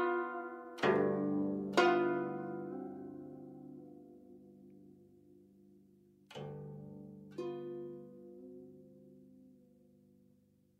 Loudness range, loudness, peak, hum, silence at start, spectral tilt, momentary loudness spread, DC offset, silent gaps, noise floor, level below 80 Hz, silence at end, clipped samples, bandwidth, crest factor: 19 LU; -37 LUFS; -16 dBFS; none; 0 s; -6.5 dB/octave; 27 LU; under 0.1%; none; -70 dBFS; -78 dBFS; 1.3 s; under 0.1%; 10 kHz; 24 dB